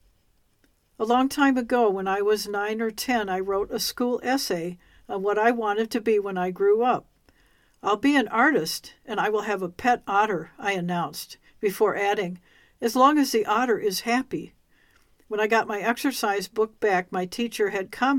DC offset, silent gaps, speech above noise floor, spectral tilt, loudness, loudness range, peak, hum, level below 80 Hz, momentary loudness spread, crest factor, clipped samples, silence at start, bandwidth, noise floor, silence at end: under 0.1%; none; 41 dB; -4 dB/octave; -24 LUFS; 2 LU; -6 dBFS; none; -60 dBFS; 10 LU; 20 dB; under 0.1%; 1 s; 17 kHz; -65 dBFS; 0 s